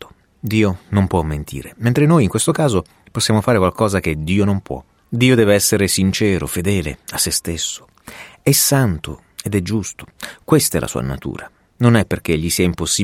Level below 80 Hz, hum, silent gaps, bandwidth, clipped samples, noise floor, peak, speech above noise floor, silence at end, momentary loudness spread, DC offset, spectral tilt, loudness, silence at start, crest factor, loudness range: -38 dBFS; none; none; 16.5 kHz; under 0.1%; -38 dBFS; -2 dBFS; 22 dB; 0 s; 16 LU; under 0.1%; -4.5 dB/octave; -17 LUFS; 0 s; 16 dB; 3 LU